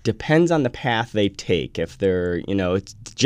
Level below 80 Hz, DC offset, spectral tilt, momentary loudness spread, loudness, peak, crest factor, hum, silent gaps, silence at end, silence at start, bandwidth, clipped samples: -46 dBFS; under 0.1%; -5.5 dB/octave; 7 LU; -22 LUFS; -2 dBFS; 18 dB; none; none; 0 s; 0.05 s; 11 kHz; under 0.1%